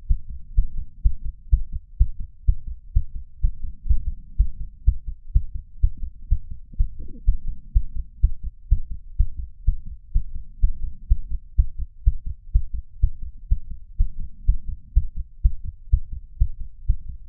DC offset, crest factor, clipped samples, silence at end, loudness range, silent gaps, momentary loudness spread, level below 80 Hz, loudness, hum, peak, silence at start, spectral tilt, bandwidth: under 0.1%; 18 dB; under 0.1%; 0 s; 1 LU; none; 11 LU; -24 dBFS; -29 LUFS; none; -4 dBFS; 0 s; -14.5 dB/octave; 0.5 kHz